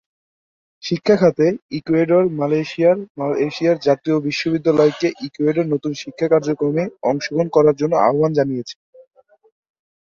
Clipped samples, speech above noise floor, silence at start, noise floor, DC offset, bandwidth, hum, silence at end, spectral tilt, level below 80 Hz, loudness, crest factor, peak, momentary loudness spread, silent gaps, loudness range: under 0.1%; over 73 dB; 0.85 s; under -90 dBFS; under 0.1%; 7.4 kHz; none; 1.45 s; -7 dB/octave; -60 dBFS; -18 LUFS; 16 dB; -2 dBFS; 8 LU; 1.62-1.69 s, 3.10-3.15 s; 2 LU